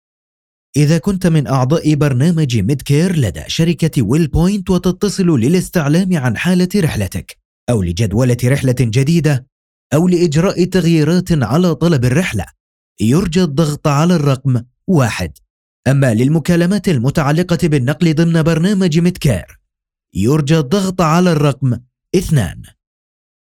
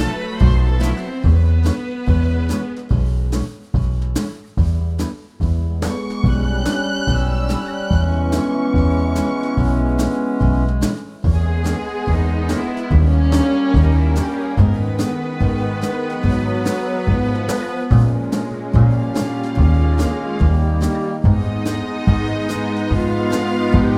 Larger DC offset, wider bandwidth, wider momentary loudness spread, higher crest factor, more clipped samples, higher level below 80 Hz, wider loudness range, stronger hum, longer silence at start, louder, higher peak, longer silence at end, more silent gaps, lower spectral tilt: neither; first, 16 kHz vs 12.5 kHz; about the same, 6 LU vs 7 LU; about the same, 14 dB vs 16 dB; neither; second, -36 dBFS vs -22 dBFS; about the same, 2 LU vs 4 LU; neither; first, 0.75 s vs 0 s; first, -14 LUFS vs -18 LUFS; about the same, 0 dBFS vs 0 dBFS; first, 0.8 s vs 0 s; first, 7.45-7.67 s, 9.52-9.90 s, 12.60-12.96 s, 15.50-15.83 s vs none; about the same, -6.5 dB/octave vs -7.5 dB/octave